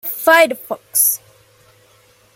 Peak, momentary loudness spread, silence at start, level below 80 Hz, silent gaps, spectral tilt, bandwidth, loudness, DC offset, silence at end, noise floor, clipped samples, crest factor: 0 dBFS; 13 LU; 0.05 s; -68 dBFS; none; 0 dB/octave; 17 kHz; -14 LUFS; under 0.1%; 1.2 s; -52 dBFS; under 0.1%; 18 dB